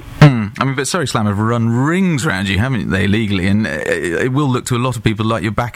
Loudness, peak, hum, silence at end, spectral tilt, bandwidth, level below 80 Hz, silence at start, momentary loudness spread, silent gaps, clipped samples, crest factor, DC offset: -16 LUFS; 0 dBFS; none; 0.05 s; -6 dB/octave; 15.5 kHz; -38 dBFS; 0 s; 4 LU; none; 0.2%; 14 dB; under 0.1%